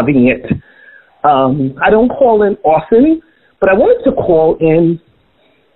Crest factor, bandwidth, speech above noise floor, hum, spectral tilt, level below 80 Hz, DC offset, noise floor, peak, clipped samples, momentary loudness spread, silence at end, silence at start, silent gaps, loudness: 12 dB; 4.1 kHz; 43 dB; none; -11.5 dB/octave; -40 dBFS; under 0.1%; -53 dBFS; 0 dBFS; under 0.1%; 7 LU; 0.8 s; 0 s; none; -11 LUFS